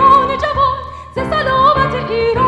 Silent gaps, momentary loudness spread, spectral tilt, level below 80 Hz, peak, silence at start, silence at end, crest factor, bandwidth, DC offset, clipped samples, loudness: none; 12 LU; -6.5 dB/octave; -32 dBFS; 0 dBFS; 0 s; 0 s; 12 dB; 9 kHz; under 0.1%; under 0.1%; -14 LUFS